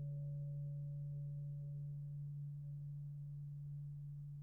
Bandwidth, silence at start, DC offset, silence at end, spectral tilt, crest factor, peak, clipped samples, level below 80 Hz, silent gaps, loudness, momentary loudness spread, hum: 0.7 kHz; 0 s; under 0.1%; 0 s; -14.5 dB/octave; 6 dB; -40 dBFS; under 0.1%; -68 dBFS; none; -48 LUFS; 4 LU; none